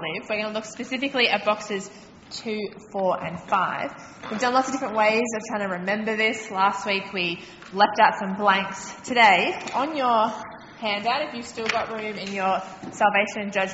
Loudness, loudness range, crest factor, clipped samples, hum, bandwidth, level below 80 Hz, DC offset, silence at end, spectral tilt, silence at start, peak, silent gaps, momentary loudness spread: -24 LUFS; 5 LU; 20 dB; under 0.1%; none; 8 kHz; -64 dBFS; under 0.1%; 0 s; -1.5 dB/octave; 0 s; -4 dBFS; none; 12 LU